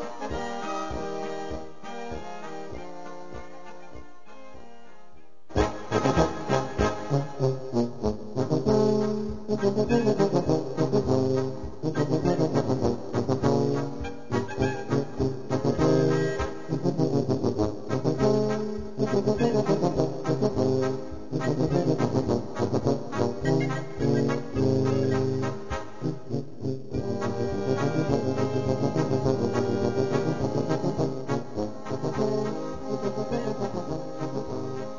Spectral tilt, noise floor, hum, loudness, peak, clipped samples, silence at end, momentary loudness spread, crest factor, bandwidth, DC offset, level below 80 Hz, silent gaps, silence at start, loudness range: -7 dB/octave; -56 dBFS; none; -27 LUFS; -8 dBFS; under 0.1%; 0 s; 10 LU; 20 dB; 7.4 kHz; 1%; -46 dBFS; none; 0 s; 6 LU